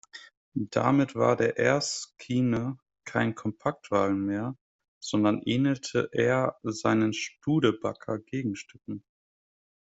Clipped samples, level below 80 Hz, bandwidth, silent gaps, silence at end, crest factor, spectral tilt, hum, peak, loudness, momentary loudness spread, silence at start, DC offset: under 0.1%; -64 dBFS; 8.2 kHz; 0.37-0.52 s, 4.61-4.79 s, 4.88-5.01 s; 0.95 s; 20 dB; -5.5 dB/octave; none; -8 dBFS; -28 LUFS; 15 LU; 0.15 s; under 0.1%